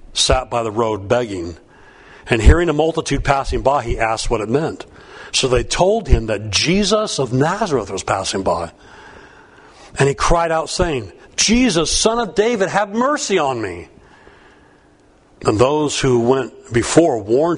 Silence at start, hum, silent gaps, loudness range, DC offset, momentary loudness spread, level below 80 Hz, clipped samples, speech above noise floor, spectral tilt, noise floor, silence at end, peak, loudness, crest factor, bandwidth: 0.05 s; none; none; 4 LU; under 0.1%; 9 LU; -26 dBFS; under 0.1%; 34 dB; -4 dB/octave; -51 dBFS; 0 s; 0 dBFS; -17 LUFS; 18 dB; 11 kHz